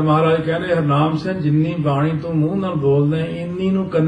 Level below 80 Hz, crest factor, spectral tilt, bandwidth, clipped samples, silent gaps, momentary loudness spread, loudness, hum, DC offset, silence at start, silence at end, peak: -50 dBFS; 12 dB; -9 dB/octave; 8.8 kHz; under 0.1%; none; 4 LU; -18 LUFS; none; under 0.1%; 0 s; 0 s; -4 dBFS